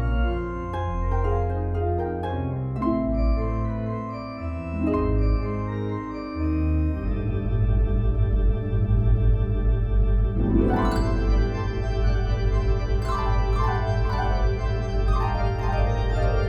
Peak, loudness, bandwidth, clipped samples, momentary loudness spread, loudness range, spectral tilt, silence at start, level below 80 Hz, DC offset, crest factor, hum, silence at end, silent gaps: -8 dBFS; -25 LUFS; 6.6 kHz; under 0.1%; 6 LU; 3 LU; -8.5 dB/octave; 0 s; -24 dBFS; under 0.1%; 14 dB; none; 0 s; none